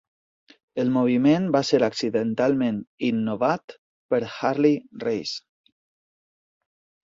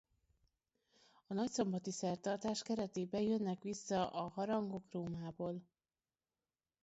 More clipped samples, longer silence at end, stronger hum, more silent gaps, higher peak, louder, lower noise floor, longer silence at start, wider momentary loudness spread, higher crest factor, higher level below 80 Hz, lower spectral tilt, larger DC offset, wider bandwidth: neither; first, 1.65 s vs 1.2 s; neither; first, 2.87-2.98 s, 3.64-3.68 s, 3.78-4.09 s vs none; first, -6 dBFS vs -24 dBFS; first, -23 LUFS vs -41 LUFS; about the same, under -90 dBFS vs under -90 dBFS; second, 0.75 s vs 1.3 s; about the same, 9 LU vs 7 LU; about the same, 18 dB vs 18 dB; first, -64 dBFS vs -74 dBFS; about the same, -6 dB/octave vs -6 dB/octave; neither; about the same, 7.8 kHz vs 8 kHz